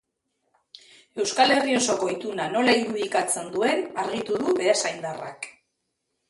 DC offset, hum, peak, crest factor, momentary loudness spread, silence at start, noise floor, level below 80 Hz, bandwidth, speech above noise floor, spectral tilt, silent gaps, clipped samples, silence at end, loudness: under 0.1%; none; -6 dBFS; 20 dB; 14 LU; 1.15 s; -78 dBFS; -70 dBFS; 11.5 kHz; 54 dB; -2.5 dB/octave; none; under 0.1%; 0.8 s; -24 LUFS